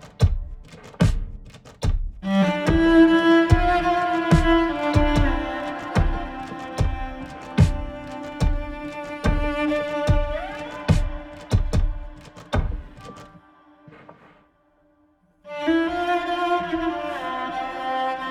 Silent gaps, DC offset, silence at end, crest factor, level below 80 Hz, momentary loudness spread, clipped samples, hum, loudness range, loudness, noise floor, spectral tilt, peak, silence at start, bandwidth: none; under 0.1%; 0 s; 20 dB; -28 dBFS; 17 LU; under 0.1%; none; 11 LU; -23 LUFS; -61 dBFS; -7 dB/octave; -2 dBFS; 0 s; 11.5 kHz